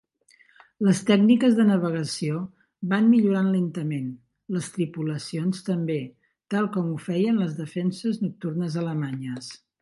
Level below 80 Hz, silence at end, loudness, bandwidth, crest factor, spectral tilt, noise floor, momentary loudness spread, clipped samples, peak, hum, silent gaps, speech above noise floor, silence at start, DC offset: -70 dBFS; 0.25 s; -24 LUFS; 11.5 kHz; 18 dB; -6.5 dB/octave; -60 dBFS; 14 LU; under 0.1%; -6 dBFS; none; none; 36 dB; 0.8 s; under 0.1%